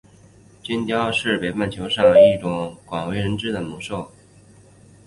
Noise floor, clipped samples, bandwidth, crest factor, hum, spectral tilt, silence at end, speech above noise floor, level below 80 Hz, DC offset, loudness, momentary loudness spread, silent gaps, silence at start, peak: -49 dBFS; under 0.1%; 11.5 kHz; 18 dB; none; -5.5 dB/octave; 1 s; 30 dB; -50 dBFS; under 0.1%; -20 LUFS; 17 LU; none; 0.65 s; -2 dBFS